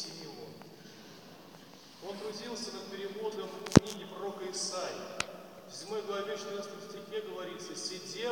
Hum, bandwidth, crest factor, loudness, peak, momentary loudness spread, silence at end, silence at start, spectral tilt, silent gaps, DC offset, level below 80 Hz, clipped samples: none; 17 kHz; 36 dB; -36 LUFS; -2 dBFS; 17 LU; 0 s; 0 s; -4.5 dB/octave; none; under 0.1%; -60 dBFS; under 0.1%